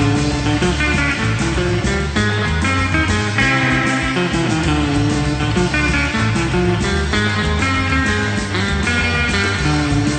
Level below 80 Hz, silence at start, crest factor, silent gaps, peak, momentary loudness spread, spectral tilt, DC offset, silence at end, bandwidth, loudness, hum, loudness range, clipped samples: -26 dBFS; 0 s; 14 dB; none; -2 dBFS; 2 LU; -5 dB/octave; under 0.1%; 0 s; 9.2 kHz; -16 LUFS; none; 1 LU; under 0.1%